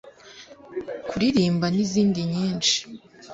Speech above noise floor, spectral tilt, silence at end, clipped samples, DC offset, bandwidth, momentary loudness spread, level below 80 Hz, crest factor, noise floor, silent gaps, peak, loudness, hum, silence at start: 23 dB; -4.5 dB/octave; 0 s; under 0.1%; under 0.1%; 8 kHz; 22 LU; -56 dBFS; 18 dB; -47 dBFS; none; -8 dBFS; -23 LUFS; none; 0.05 s